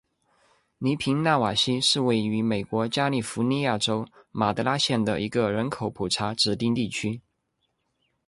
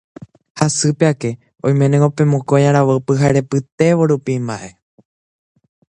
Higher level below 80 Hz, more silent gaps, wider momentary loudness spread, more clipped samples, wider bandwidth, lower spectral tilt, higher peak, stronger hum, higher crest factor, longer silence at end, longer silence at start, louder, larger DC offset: second, -58 dBFS vs -52 dBFS; second, none vs 3.72-3.78 s; about the same, 8 LU vs 10 LU; neither; about the same, 11.5 kHz vs 10.5 kHz; second, -4.5 dB/octave vs -6.5 dB/octave; second, -8 dBFS vs 0 dBFS; neither; about the same, 18 dB vs 16 dB; second, 1.1 s vs 1.25 s; first, 0.8 s vs 0.55 s; second, -25 LUFS vs -15 LUFS; neither